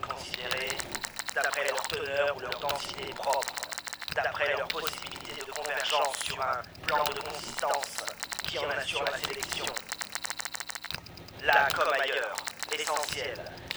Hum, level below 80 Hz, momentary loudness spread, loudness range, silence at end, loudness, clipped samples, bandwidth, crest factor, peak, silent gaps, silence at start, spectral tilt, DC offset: none; -60 dBFS; 9 LU; 3 LU; 0 s; -31 LUFS; under 0.1%; over 20 kHz; 24 dB; -8 dBFS; none; 0 s; -1 dB/octave; under 0.1%